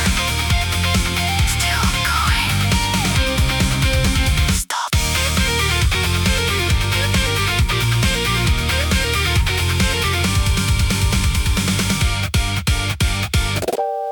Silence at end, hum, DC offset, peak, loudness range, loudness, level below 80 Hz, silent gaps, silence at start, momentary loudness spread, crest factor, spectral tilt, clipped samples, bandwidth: 0 s; none; under 0.1%; -4 dBFS; 1 LU; -17 LUFS; -24 dBFS; none; 0 s; 2 LU; 14 dB; -3.5 dB/octave; under 0.1%; 19 kHz